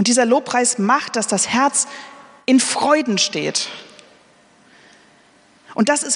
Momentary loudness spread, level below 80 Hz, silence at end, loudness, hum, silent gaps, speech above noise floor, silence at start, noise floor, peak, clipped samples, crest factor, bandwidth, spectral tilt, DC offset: 12 LU; -68 dBFS; 0 s; -17 LUFS; none; none; 35 dB; 0 s; -52 dBFS; -2 dBFS; under 0.1%; 18 dB; 11 kHz; -2.5 dB/octave; under 0.1%